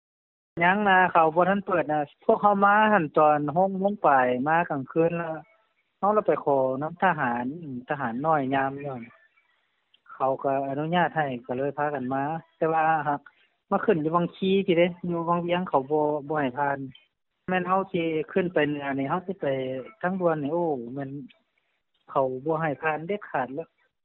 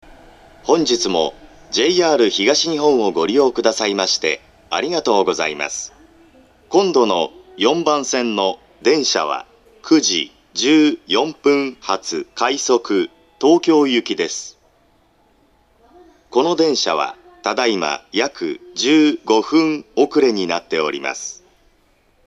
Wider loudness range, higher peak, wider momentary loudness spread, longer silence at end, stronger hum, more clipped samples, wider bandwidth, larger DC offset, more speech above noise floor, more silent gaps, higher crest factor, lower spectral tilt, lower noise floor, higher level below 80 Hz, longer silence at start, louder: first, 7 LU vs 4 LU; second, -6 dBFS vs 0 dBFS; about the same, 11 LU vs 10 LU; second, 0.4 s vs 0.95 s; neither; neither; second, 4.2 kHz vs 10.5 kHz; neither; first, 49 dB vs 41 dB; neither; about the same, 20 dB vs 18 dB; first, -5 dB/octave vs -3 dB/octave; first, -74 dBFS vs -57 dBFS; second, -68 dBFS vs -58 dBFS; about the same, 0.55 s vs 0.65 s; second, -25 LUFS vs -17 LUFS